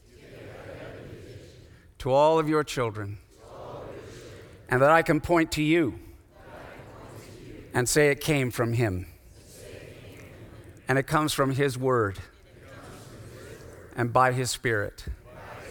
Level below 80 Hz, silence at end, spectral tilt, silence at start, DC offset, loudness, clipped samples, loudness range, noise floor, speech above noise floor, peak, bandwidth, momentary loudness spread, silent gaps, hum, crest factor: -50 dBFS; 0 s; -5 dB/octave; 0.25 s; under 0.1%; -25 LUFS; under 0.1%; 4 LU; -51 dBFS; 27 dB; -6 dBFS; 19.5 kHz; 24 LU; none; none; 22 dB